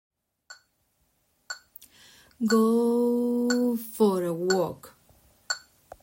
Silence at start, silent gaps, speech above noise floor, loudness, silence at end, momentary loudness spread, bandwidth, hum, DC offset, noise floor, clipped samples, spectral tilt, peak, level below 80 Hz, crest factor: 0.5 s; none; 47 dB; -25 LUFS; 0.45 s; 18 LU; 16.5 kHz; none; under 0.1%; -71 dBFS; under 0.1%; -5 dB/octave; -10 dBFS; -70 dBFS; 18 dB